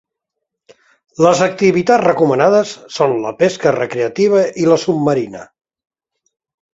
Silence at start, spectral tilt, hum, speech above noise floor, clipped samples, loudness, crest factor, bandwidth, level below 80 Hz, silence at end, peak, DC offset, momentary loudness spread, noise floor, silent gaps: 1.2 s; -5.5 dB/octave; none; 65 dB; under 0.1%; -14 LUFS; 16 dB; 8 kHz; -58 dBFS; 1.3 s; 0 dBFS; under 0.1%; 7 LU; -78 dBFS; none